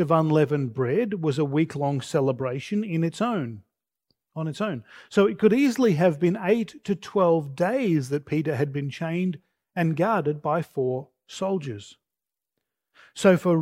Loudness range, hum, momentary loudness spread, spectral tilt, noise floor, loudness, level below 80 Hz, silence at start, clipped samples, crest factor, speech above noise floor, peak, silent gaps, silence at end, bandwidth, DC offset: 5 LU; none; 12 LU; -7 dB/octave; -89 dBFS; -24 LUFS; -68 dBFS; 0 s; under 0.1%; 20 dB; 65 dB; -4 dBFS; none; 0 s; 15.5 kHz; under 0.1%